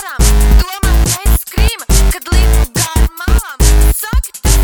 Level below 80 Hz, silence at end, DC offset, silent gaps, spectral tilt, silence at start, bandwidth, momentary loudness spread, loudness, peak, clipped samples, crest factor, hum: -10 dBFS; 0 s; under 0.1%; none; -4 dB/octave; 0 s; 20 kHz; 5 LU; -13 LUFS; 0 dBFS; under 0.1%; 10 dB; none